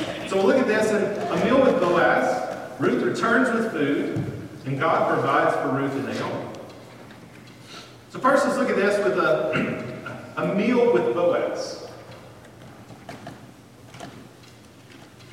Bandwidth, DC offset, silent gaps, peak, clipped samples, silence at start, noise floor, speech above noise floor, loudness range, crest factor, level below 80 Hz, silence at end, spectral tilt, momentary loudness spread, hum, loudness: 15.5 kHz; under 0.1%; none; -6 dBFS; under 0.1%; 0 s; -47 dBFS; 26 dB; 9 LU; 18 dB; -60 dBFS; 0 s; -6 dB/octave; 22 LU; none; -22 LUFS